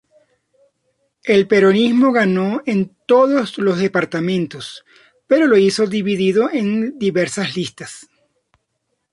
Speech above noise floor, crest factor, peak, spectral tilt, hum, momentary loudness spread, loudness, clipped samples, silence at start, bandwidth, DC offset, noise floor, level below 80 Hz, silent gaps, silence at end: 56 dB; 16 dB; -2 dBFS; -6 dB/octave; none; 13 LU; -16 LUFS; under 0.1%; 1.25 s; 11.5 kHz; under 0.1%; -72 dBFS; -60 dBFS; none; 1.1 s